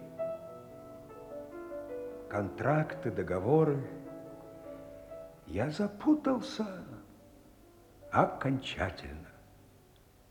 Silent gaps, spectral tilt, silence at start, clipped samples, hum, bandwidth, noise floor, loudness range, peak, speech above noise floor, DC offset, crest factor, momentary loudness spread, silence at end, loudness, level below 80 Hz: none; -7.5 dB/octave; 0 s; under 0.1%; none; 19.5 kHz; -61 dBFS; 3 LU; -10 dBFS; 29 dB; under 0.1%; 26 dB; 20 LU; 0.65 s; -33 LUFS; -60 dBFS